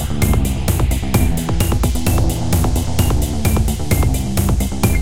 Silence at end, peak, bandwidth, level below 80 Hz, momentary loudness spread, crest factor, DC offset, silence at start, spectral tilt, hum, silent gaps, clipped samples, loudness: 0 s; -2 dBFS; 17 kHz; -20 dBFS; 1 LU; 14 dB; 4%; 0 s; -5.5 dB/octave; none; none; under 0.1%; -17 LUFS